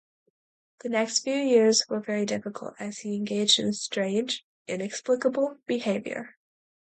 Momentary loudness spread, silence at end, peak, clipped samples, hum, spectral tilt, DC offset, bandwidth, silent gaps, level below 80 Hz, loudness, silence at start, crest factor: 15 LU; 0.65 s; -6 dBFS; under 0.1%; none; -3 dB/octave; under 0.1%; 9.4 kHz; 4.43-4.65 s; -74 dBFS; -26 LUFS; 0.85 s; 22 dB